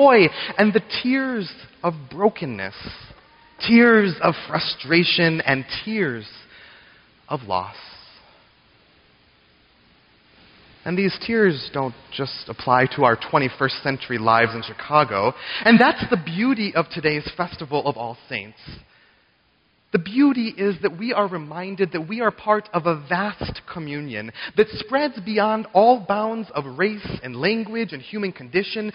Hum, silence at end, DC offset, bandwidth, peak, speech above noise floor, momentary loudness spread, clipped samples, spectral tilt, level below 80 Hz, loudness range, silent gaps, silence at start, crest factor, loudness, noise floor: none; 0.05 s; under 0.1%; 5.6 kHz; -2 dBFS; 41 dB; 15 LU; under 0.1%; -3.5 dB/octave; -54 dBFS; 9 LU; none; 0 s; 18 dB; -21 LUFS; -62 dBFS